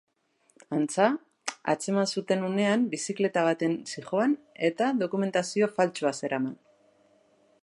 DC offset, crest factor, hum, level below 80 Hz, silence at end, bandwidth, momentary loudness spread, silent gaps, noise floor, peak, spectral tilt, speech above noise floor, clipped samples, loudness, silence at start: under 0.1%; 20 dB; none; -80 dBFS; 1.1 s; 11.5 kHz; 6 LU; none; -67 dBFS; -8 dBFS; -5 dB/octave; 40 dB; under 0.1%; -28 LUFS; 0.7 s